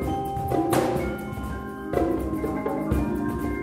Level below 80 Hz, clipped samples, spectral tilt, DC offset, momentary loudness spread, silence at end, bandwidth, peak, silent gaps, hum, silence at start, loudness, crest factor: -36 dBFS; under 0.1%; -7 dB/octave; under 0.1%; 9 LU; 0 s; 16 kHz; -8 dBFS; none; none; 0 s; -27 LUFS; 18 dB